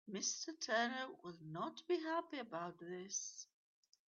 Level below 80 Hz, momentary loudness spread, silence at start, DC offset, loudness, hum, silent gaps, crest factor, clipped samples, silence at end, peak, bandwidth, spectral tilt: under -90 dBFS; 12 LU; 0.05 s; under 0.1%; -43 LUFS; none; none; 18 dB; under 0.1%; 0.65 s; -26 dBFS; 7.6 kHz; -2.5 dB/octave